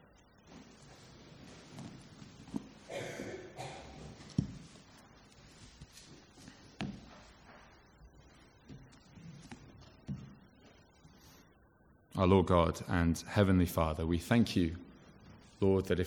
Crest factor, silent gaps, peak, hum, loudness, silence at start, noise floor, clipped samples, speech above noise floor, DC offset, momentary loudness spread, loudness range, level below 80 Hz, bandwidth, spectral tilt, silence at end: 26 dB; none; -12 dBFS; none; -34 LUFS; 0.5 s; -65 dBFS; under 0.1%; 35 dB; under 0.1%; 27 LU; 22 LU; -54 dBFS; 18.5 kHz; -6.5 dB/octave; 0 s